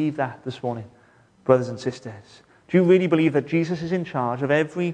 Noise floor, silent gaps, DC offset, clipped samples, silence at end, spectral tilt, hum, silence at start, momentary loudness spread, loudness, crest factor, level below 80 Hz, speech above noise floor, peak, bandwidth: -54 dBFS; none; under 0.1%; under 0.1%; 0 s; -7.5 dB/octave; none; 0 s; 14 LU; -22 LUFS; 20 dB; -64 dBFS; 32 dB; -2 dBFS; 9.4 kHz